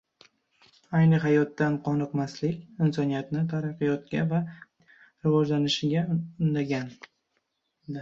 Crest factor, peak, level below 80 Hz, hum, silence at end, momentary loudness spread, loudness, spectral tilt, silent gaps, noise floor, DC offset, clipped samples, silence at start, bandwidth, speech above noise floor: 16 dB; -12 dBFS; -66 dBFS; none; 0 s; 9 LU; -27 LUFS; -7 dB/octave; none; -77 dBFS; under 0.1%; under 0.1%; 0.9 s; 7.4 kHz; 51 dB